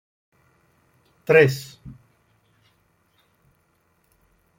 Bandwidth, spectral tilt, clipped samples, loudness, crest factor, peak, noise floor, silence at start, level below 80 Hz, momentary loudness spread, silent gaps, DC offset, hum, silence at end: 16.5 kHz; -6 dB/octave; under 0.1%; -18 LUFS; 24 dB; -2 dBFS; -66 dBFS; 1.3 s; -62 dBFS; 29 LU; none; under 0.1%; none; 2.65 s